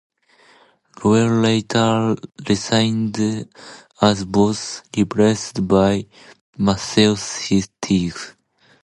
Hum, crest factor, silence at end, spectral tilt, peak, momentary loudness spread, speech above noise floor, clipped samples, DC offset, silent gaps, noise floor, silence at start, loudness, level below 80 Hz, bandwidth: none; 18 dB; 0.55 s; -5.5 dB/octave; 0 dBFS; 10 LU; 35 dB; under 0.1%; under 0.1%; 6.41-6.53 s; -53 dBFS; 1 s; -19 LUFS; -46 dBFS; 11.5 kHz